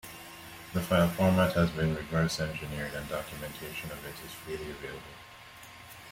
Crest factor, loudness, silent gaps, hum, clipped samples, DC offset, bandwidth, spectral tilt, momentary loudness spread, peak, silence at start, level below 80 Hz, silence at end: 20 dB; -31 LUFS; none; none; under 0.1%; under 0.1%; 16.5 kHz; -6 dB/octave; 22 LU; -12 dBFS; 0.05 s; -52 dBFS; 0 s